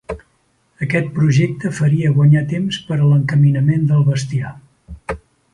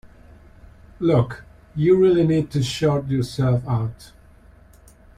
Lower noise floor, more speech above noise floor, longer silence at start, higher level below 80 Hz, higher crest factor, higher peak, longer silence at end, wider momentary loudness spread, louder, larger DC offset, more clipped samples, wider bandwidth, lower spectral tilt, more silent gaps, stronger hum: first, -61 dBFS vs -49 dBFS; first, 46 dB vs 30 dB; second, 0.1 s vs 1 s; about the same, -44 dBFS vs -48 dBFS; about the same, 14 dB vs 16 dB; first, -2 dBFS vs -6 dBFS; second, 0.35 s vs 1.1 s; first, 16 LU vs 12 LU; first, -16 LUFS vs -20 LUFS; neither; neither; second, 10.5 kHz vs 13 kHz; about the same, -7.5 dB/octave vs -7.5 dB/octave; neither; neither